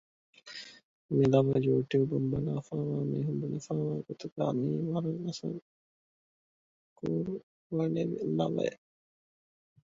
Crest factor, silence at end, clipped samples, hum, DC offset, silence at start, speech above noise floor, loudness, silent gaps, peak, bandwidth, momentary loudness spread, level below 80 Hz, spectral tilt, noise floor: 20 dB; 1.15 s; under 0.1%; none; under 0.1%; 0.45 s; over 59 dB; -32 LUFS; 0.84-1.09 s, 4.32-4.36 s, 5.62-6.96 s, 7.43-7.70 s; -12 dBFS; 7.6 kHz; 15 LU; -64 dBFS; -8 dB/octave; under -90 dBFS